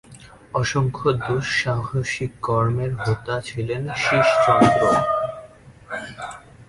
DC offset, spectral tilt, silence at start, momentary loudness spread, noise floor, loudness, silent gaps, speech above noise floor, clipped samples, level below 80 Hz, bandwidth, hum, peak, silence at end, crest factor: under 0.1%; -5.5 dB/octave; 0.1 s; 17 LU; -45 dBFS; -21 LUFS; none; 25 dB; under 0.1%; -48 dBFS; 11.5 kHz; none; -2 dBFS; 0.05 s; 20 dB